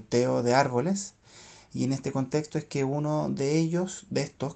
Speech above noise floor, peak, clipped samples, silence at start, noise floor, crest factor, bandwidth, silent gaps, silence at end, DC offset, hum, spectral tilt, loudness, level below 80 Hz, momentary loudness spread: 25 dB; -8 dBFS; under 0.1%; 0 s; -52 dBFS; 20 dB; 9 kHz; none; 0 s; under 0.1%; none; -6 dB/octave; -28 LUFS; -64 dBFS; 8 LU